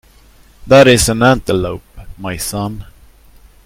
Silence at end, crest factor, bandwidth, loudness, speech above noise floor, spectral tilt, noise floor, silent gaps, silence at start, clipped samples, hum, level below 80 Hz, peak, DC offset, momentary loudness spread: 0.85 s; 14 dB; 16.5 kHz; -12 LUFS; 33 dB; -4.5 dB/octave; -45 dBFS; none; 0.6 s; 0.3%; none; -34 dBFS; 0 dBFS; under 0.1%; 20 LU